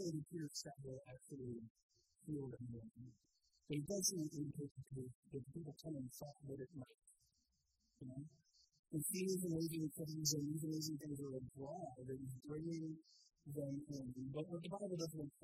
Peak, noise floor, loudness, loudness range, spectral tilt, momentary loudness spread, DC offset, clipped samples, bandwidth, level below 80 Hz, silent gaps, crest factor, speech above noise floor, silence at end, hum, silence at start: -26 dBFS; -84 dBFS; -47 LUFS; 10 LU; -5 dB/octave; 15 LU; under 0.1%; under 0.1%; 15.5 kHz; -76 dBFS; 1.70-1.75 s, 1.83-1.89 s, 4.71-4.75 s, 5.15-5.23 s, 8.79-8.83 s; 22 dB; 37 dB; 0.15 s; none; 0 s